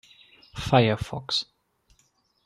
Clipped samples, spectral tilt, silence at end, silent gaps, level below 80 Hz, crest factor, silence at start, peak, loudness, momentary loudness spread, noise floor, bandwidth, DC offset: under 0.1%; -5.5 dB/octave; 1 s; none; -50 dBFS; 24 dB; 0.55 s; -4 dBFS; -25 LUFS; 20 LU; -67 dBFS; 12.5 kHz; under 0.1%